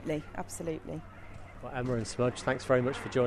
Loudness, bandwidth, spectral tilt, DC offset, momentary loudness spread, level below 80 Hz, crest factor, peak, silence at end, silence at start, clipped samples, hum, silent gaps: -33 LUFS; 13.5 kHz; -5.5 dB/octave; under 0.1%; 18 LU; -52 dBFS; 20 dB; -12 dBFS; 0 s; 0 s; under 0.1%; none; none